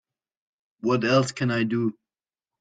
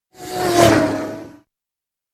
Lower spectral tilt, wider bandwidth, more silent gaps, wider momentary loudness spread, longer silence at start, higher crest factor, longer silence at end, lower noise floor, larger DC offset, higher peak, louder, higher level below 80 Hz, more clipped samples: first, -6 dB/octave vs -4.5 dB/octave; second, 9.4 kHz vs 16.5 kHz; neither; second, 8 LU vs 17 LU; first, 0.85 s vs 0.2 s; about the same, 20 dB vs 20 dB; about the same, 0.7 s vs 0.8 s; first, under -90 dBFS vs -86 dBFS; neither; second, -8 dBFS vs 0 dBFS; second, -24 LUFS vs -16 LUFS; second, -64 dBFS vs -44 dBFS; neither